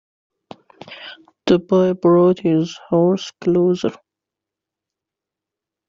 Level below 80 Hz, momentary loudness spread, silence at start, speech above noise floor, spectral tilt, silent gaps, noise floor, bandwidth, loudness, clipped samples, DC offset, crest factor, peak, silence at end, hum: -58 dBFS; 21 LU; 0.9 s; 69 dB; -7 dB/octave; none; -85 dBFS; 7.4 kHz; -17 LUFS; under 0.1%; under 0.1%; 16 dB; -2 dBFS; 1.95 s; none